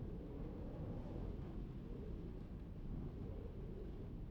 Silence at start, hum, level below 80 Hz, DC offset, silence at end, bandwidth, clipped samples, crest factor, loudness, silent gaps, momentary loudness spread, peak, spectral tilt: 0 s; none; -52 dBFS; under 0.1%; 0 s; 6 kHz; under 0.1%; 14 dB; -50 LUFS; none; 3 LU; -34 dBFS; -10 dB/octave